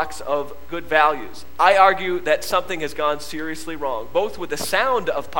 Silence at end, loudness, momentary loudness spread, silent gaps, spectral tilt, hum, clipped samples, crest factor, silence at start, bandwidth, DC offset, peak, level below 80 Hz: 0 s; -20 LUFS; 14 LU; none; -3 dB/octave; none; under 0.1%; 22 dB; 0 s; 17.5 kHz; 3%; 0 dBFS; -48 dBFS